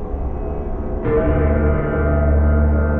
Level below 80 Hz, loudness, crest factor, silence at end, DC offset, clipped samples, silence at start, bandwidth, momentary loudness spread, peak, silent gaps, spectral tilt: -20 dBFS; -19 LUFS; 12 dB; 0 s; under 0.1%; under 0.1%; 0 s; 3 kHz; 10 LU; -6 dBFS; none; -12.5 dB/octave